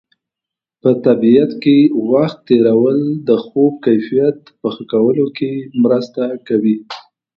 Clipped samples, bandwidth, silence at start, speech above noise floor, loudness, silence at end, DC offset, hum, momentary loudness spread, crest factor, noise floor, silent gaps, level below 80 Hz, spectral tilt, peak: under 0.1%; 6.4 kHz; 0.85 s; 72 dB; -14 LUFS; 0.35 s; under 0.1%; none; 11 LU; 14 dB; -85 dBFS; none; -62 dBFS; -9 dB/octave; 0 dBFS